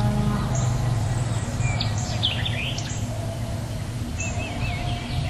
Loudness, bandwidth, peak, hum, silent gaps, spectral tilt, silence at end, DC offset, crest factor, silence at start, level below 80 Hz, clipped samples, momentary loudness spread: -26 LUFS; 13 kHz; -10 dBFS; none; none; -5 dB/octave; 0 s; under 0.1%; 16 dB; 0 s; -34 dBFS; under 0.1%; 6 LU